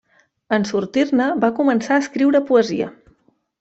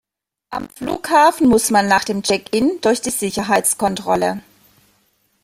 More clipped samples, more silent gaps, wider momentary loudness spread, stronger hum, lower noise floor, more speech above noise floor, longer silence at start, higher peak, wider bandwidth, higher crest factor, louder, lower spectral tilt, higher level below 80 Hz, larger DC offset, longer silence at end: neither; neither; second, 6 LU vs 13 LU; neither; about the same, -60 dBFS vs -62 dBFS; about the same, 43 dB vs 45 dB; about the same, 0.5 s vs 0.5 s; about the same, -4 dBFS vs -2 dBFS; second, 8 kHz vs 16 kHz; about the same, 16 dB vs 16 dB; about the same, -18 LUFS vs -17 LUFS; first, -5.5 dB/octave vs -3.5 dB/octave; second, -62 dBFS vs -50 dBFS; neither; second, 0.7 s vs 1.05 s